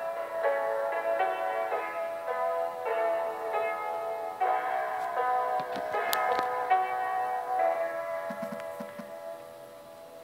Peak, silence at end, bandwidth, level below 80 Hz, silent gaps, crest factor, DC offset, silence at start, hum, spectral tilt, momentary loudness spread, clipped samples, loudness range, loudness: -6 dBFS; 0 s; 16 kHz; -78 dBFS; none; 24 dB; under 0.1%; 0 s; none; -3 dB/octave; 14 LU; under 0.1%; 2 LU; -31 LUFS